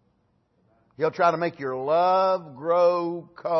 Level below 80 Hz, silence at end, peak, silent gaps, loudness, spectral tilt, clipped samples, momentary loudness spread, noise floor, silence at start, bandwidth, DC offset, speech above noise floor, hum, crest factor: -76 dBFS; 0 s; -8 dBFS; none; -24 LUFS; -6.5 dB/octave; under 0.1%; 9 LU; -68 dBFS; 1 s; 6.2 kHz; under 0.1%; 45 dB; none; 16 dB